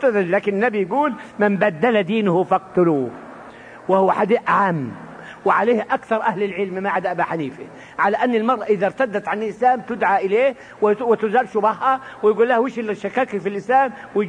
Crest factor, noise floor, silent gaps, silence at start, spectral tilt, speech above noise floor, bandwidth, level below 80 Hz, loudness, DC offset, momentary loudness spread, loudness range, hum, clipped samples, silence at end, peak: 16 dB; -39 dBFS; none; 0 s; -7 dB/octave; 21 dB; 10 kHz; -62 dBFS; -19 LUFS; under 0.1%; 8 LU; 2 LU; none; under 0.1%; 0 s; -4 dBFS